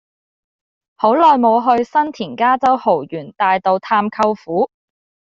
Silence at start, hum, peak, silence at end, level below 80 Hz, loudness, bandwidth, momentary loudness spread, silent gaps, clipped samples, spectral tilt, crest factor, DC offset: 1 s; none; -2 dBFS; 0.65 s; -62 dBFS; -15 LUFS; 7.6 kHz; 9 LU; none; under 0.1%; -6.5 dB/octave; 14 dB; under 0.1%